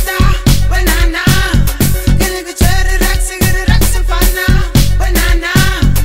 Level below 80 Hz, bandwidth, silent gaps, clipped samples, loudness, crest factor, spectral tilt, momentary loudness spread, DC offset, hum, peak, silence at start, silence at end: -12 dBFS; 16.5 kHz; none; under 0.1%; -12 LUFS; 10 dB; -4.5 dB/octave; 2 LU; 4%; none; 0 dBFS; 0 s; 0 s